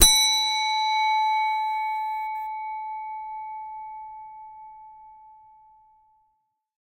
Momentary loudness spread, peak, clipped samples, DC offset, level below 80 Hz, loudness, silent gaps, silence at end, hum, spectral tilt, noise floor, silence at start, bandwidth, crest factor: 22 LU; 0 dBFS; under 0.1%; under 0.1%; -44 dBFS; -24 LUFS; none; 1.45 s; none; 1 dB/octave; -73 dBFS; 0 s; 16.5 kHz; 26 dB